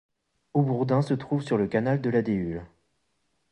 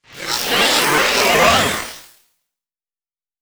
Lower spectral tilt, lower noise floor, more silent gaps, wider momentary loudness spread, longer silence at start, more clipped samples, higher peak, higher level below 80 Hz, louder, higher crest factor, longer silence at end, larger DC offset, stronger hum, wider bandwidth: first, -9 dB/octave vs -1.5 dB/octave; second, -75 dBFS vs under -90 dBFS; neither; second, 5 LU vs 11 LU; first, 0.55 s vs 0.15 s; neither; second, -10 dBFS vs 0 dBFS; second, -56 dBFS vs -44 dBFS; second, -26 LUFS vs -14 LUFS; about the same, 16 dB vs 18 dB; second, 0.85 s vs 1.4 s; neither; neither; second, 10 kHz vs over 20 kHz